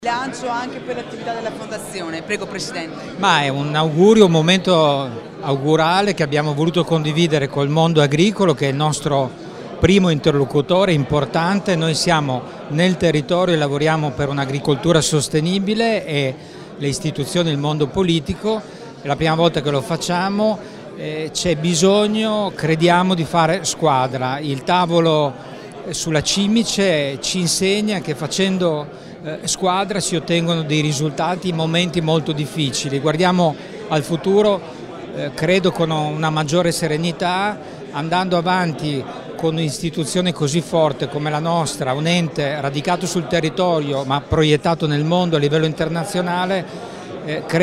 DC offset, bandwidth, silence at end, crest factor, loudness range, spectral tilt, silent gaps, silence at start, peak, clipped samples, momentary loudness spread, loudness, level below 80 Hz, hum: under 0.1%; 14.5 kHz; 0 s; 18 dB; 4 LU; -5 dB/octave; none; 0 s; 0 dBFS; under 0.1%; 11 LU; -18 LUFS; -46 dBFS; none